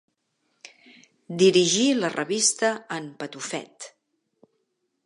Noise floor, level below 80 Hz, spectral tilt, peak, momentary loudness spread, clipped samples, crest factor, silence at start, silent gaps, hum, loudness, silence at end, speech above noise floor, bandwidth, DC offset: -75 dBFS; -78 dBFS; -3 dB/octave; -6 dBFS; 19 LU; under 0.1%; 20 dB; 1.3 s; none; none; -23 LUFS; 1.15 s; 52 dB; 11.5 kHz; under 0.1%